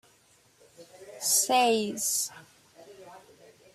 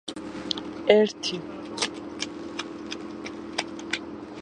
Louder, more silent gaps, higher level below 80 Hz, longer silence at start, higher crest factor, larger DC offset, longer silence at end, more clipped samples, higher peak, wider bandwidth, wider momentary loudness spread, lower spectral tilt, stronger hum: first, -25 LUFS vs -28 LUFS; neither; second, -78 dBFS vs -60 dBFS; first, 0.8 s vs 0.05 s; second, 20 dB vs 26 dB; neither; first, 0.55 s vs 0 s; neither; second, -12 dBFS vs -4 dBFS; first, 15 kHz vs 11 kHz; first, 19 LU vs 16 LU; second, -1 dB/octave vs -3.5 dB/octave; neither